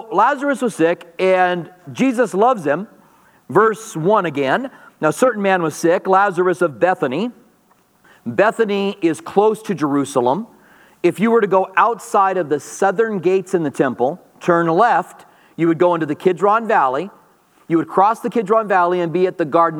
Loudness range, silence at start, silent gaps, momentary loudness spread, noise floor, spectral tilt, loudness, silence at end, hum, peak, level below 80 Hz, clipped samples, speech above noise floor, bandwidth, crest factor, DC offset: 2 LU; 0 s; none; 7 LU; -56 dBFS; -6 dB/octave; -17 LUFS; 0 s; none; 0 dBFS; -72 dBFS; under 0.1%; 40 dB; 15.5 kHz; 16 dB; under 0.1%